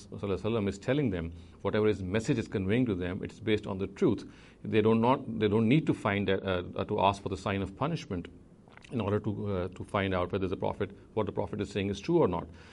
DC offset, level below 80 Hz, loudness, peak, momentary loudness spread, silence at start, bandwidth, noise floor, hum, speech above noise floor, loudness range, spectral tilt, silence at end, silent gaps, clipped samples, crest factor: under 0.1%; -56 dBFS; -31 LUFS; -10 dBFS; 10 LU; 0 s; 11.5 kHz; -53 dBFS; none; 23 dB; 5 LU; -7 dB/octave; 0 s; none; under 0.1%; 20 dB